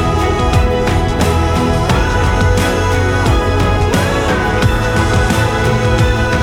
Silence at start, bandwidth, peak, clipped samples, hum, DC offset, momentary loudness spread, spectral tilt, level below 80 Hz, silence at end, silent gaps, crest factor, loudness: 0 s; 16.5 kHz; -2 dBFS; under 0.1%; none; under 0.1%; 1 LU; -5.5 dB/octave; -20 dBFS; 0 s; none; 12 dB; -13 LUFS